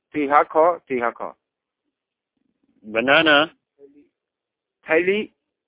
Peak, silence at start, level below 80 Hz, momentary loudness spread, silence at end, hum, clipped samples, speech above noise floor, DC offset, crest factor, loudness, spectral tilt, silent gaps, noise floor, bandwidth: -2 dBFS; 0.15 s; -64 dBFS; 14 LU; 0.4 s; none; under 0.1%; 66 dB; under 0.1%; 20 dB; -19 LUFS; -7.5 dB/octave; none; -84 dBFS; 4 kHz